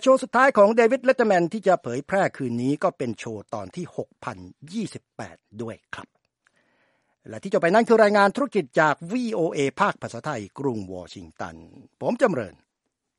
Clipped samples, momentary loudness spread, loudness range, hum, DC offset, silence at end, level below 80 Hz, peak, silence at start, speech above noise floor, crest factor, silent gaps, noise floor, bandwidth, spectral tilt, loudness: under 0.1%; 20 LU; 14 LU; none; under 0.1%; 0.7 s; -66 dBFS; -4 dBFS; 0 s; 57 dB; 20 dB; none; -80 dBFS; 11.5 kHz; -6 dB/octave; -22 LUFS